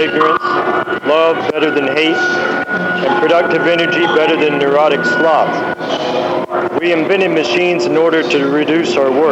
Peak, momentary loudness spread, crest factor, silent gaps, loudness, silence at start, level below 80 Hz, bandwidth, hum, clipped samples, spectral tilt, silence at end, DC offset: 0 dBFS; 5 LU; 12 dB; none; -13 LUFS; 0 s; -58 dBFS; 9 kHz; none; under 0.1%; -5 dB/octave; 0 s; under 0.1%